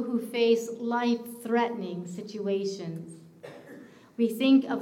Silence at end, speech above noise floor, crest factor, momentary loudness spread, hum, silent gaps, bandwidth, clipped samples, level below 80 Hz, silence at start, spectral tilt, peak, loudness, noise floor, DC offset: 0 s; 22 dB; 16 dB; 24 LU; none; none; 16.5 kHz; under 0.1%; -80 dBFS; 0 s; -5.5 dB/octave; -12 dBFS; -28 LUFS; -49 dBFS; under 0.1%